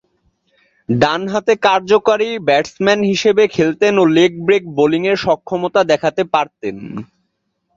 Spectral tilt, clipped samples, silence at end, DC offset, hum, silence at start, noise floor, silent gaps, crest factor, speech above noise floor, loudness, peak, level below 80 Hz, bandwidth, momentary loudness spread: -5.5 dB/octave; under 0.1%; 0.75 s; under 0.1%; none; 0.9 s; -69 dBFS; none; 14 dB; 55 dB; -15 LUFS; 0 dBFS; -54 dBFS; 7.6 kHz; 10 LU